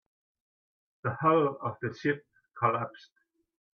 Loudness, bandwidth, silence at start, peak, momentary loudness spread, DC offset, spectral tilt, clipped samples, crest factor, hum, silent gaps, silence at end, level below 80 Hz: -30 LUFS; 6.6 kHz; 1.05 s; -12 dBFS; 12 LU; under 0.1%; -8 dB/octave; under 0.1%; 20 dB; none; none; 0.75 s; -72 dBFS